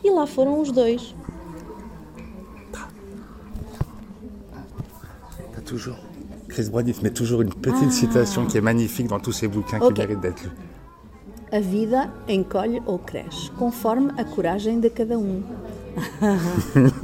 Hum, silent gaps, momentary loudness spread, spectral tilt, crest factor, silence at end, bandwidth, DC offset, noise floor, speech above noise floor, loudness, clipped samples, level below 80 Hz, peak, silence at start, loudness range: none; none; 21 LU; -6 dB/octave; 20 dB; 0 s; 16.5 kHz; under 0.1%; -44 dBFS; 23 dB; -23 LUFS; under 0.1%; -44 dBFS; -2 dBFS; 0 s; 16 LU